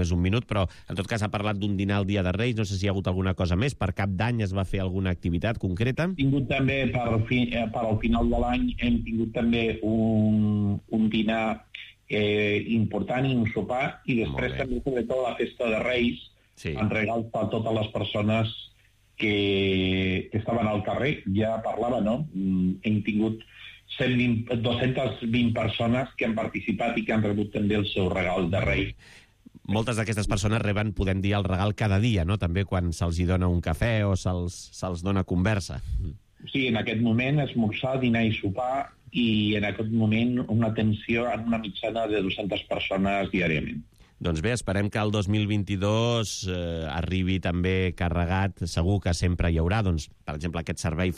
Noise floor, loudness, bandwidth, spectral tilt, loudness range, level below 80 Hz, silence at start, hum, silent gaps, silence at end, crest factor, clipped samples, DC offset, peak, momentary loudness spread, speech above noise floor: -60 dBFS; -26 LUFS; 12 kHz; -6.5 dB/octave; 2 LU; -42 dBFS; 0 s; none; none; 0 s; 12 dB; under 0.1%; under 0.1%; -14 dBFS; 6 LU; 34 dB